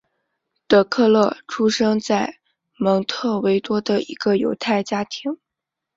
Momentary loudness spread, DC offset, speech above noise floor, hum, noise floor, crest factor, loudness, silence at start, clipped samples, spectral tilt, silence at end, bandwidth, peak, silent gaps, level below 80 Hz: 10 LU; under 0.1%; 64 dB; none; -84 dBFS; 18 dB; -20 LUFS; 0.7 s; under 0.1%; -5 dB/octave; 0.6 s; 7.8 kHz; -2 dBFS; none; -60 dBFS